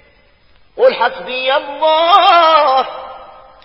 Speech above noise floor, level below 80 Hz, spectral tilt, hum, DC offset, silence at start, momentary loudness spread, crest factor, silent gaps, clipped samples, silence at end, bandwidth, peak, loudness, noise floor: 39 dB; -54 dBFS; -3.5 dB/octave; none; 0.2%; 0.75 s; 13 LU; 14 dB; none; under 0.1%; 0.4 s; 8 kHz; 0 dBFS; -11 LUFS; -50 dBFS